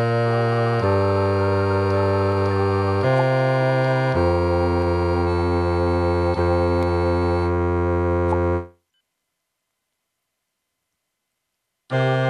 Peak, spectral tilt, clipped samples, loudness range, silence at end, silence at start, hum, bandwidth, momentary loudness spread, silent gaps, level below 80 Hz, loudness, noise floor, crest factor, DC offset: -8 dBFS; -8.5 dB/octave; under 0.1%; 7 LU; 0 s; 0 s; none; 10.5 kHz; 2 LU; none; -38 dBFS; -20 LUFS; -78 dBFS; 12 dB; under 0.1%